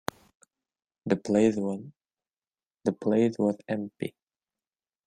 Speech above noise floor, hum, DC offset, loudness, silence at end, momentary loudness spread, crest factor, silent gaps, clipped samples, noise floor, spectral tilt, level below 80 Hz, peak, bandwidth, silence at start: over 63 dB; none; under 0.1%; -28 LUFS; 0.95 s; 14 LU; 22 dB; 2.67-2.71 s; under 0.1%; under -90 dBFS; -7 dB/octave; -68 dBFS; -8 dBFS; 15.5 kHz; 1.05 s